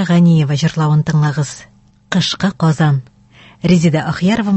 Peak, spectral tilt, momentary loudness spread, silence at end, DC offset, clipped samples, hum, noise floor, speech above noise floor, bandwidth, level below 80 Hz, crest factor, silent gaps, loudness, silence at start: 0 dBFS; -6.5 dB/octave; 9 LU; 0 s; under 0.1%; under 0.1%; none; -44 dBFS; 31 dB; 8.4 kHz; -46 dBFS; 14 dB; none; -14 LUFS; 0 s